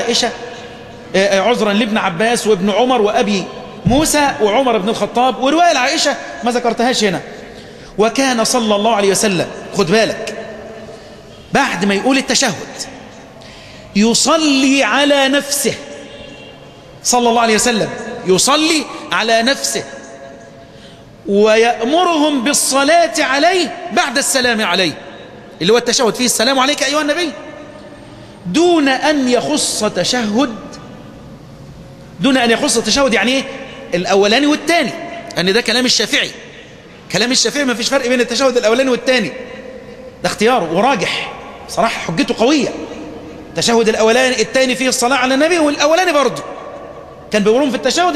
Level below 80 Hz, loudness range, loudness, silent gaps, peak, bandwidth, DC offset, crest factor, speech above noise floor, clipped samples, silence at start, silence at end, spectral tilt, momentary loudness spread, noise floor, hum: -46 dBFS; 3 LU; -13 LUFS; none; 0 dBFS; 14.5 kHz; under 0.1%; 14 dB; 24 dB; under 0.1%; 0 s; 0 s; -3 dB/octave; 19 LU; -38 dBFS; none